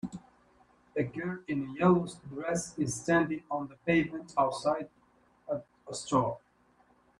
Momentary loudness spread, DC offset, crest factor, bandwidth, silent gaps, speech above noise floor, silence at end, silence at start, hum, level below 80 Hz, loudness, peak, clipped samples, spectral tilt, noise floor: 13 LU; under 0.1%; 20 dB; 11.5 kHz; none; 36 dB; 0.8 s; 0.05 s; none; -64 dBFS; -32 LUFS; -14 dBFS; under 0.1%; -5.5 dB/octave; -66 dBFS